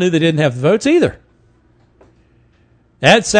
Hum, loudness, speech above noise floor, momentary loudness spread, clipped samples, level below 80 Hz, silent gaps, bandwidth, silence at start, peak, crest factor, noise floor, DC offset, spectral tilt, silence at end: none; -14 LUFS; 41 dB; 4 LU; 0.2%; -48 dBFS; none; 11 kHz; 0 s; 0 dBFS; 16 dB; -53 dBFS; under 0.1%; -5 dB/octave; 0 s